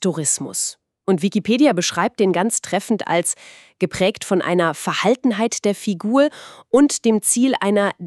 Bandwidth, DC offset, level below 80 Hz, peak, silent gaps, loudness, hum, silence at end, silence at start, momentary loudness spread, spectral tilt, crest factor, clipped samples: 13.5 kHz; under 0.1%; -60 dBFS; -2 dBFS; none; -19 LUFS; none; 0 s; 0 s; 7 LU; -4 dB/octave; 16 dB; under 0.1%